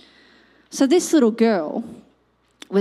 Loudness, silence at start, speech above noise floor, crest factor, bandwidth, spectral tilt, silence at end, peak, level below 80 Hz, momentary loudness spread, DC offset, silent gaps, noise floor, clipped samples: -19 LUFS; 0.7 s; 44 dB; 16 dB; 15 kHz; -4.5 dB/octave; 0 s; -6 dBFS; -68 dBFS; 16 LU; under 0.1%; none; -62 dBFS; under 0.1%